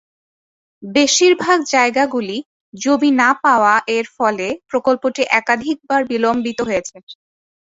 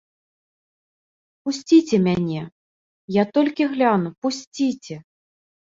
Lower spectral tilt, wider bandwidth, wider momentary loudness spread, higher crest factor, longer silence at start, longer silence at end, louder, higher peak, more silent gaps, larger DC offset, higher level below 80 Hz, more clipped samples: second, -2.5 dB/octave vs -6 dB/octave; about the same, 8 kHz vs 7.8 kHz; second, 10 LU vs 16 LU; about the same, 16 dB vs 18 dB; second, 0.8 s vs 1.45 s; about the same, 0.6 s vs 0.65 s; first, -16 LUFS vs -21 LUFS; about the same, -2 dBFS vs -4 dBFS; second, 2.45-2.72 s, 7.03-7.07 s vs 2.52-3.08 s, 4.18-4.22 s, 4.47-4.52 s; neither; about the same, -58 dBFS vs -60 dBFS; neither